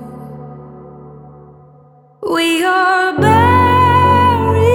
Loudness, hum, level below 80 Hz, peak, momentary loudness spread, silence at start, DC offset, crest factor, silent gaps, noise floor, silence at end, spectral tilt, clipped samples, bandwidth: -11 LUFS; none; -40 dBFS; 0 dBFS; 22 LU; 0 s; under 0.1%; 14 dB; none; -45 dBFS; 0 s; -6 dB/octave; under 0.1%; 18 kHz